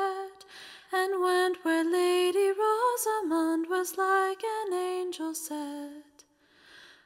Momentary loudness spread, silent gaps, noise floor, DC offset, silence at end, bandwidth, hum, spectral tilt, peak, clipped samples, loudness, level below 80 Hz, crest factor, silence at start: 14 LU; none; -61 dBFS; under 0.1%; 0.25 s; 16 kHz; none; -1 dB/octave; -14 dBFS; under 0.1%; -28 LUFS; -80 dBFS; 14 dB; 0 s